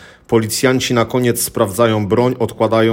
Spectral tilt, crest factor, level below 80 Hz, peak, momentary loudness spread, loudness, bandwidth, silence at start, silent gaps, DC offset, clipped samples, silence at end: -5 dB/octave; 14 dB; -48 dBFS; 0 dBFS; 3 LU; -15 LUFS; 17 kHz; 0 s; none; under 0.1%; under 0.1%; 0 s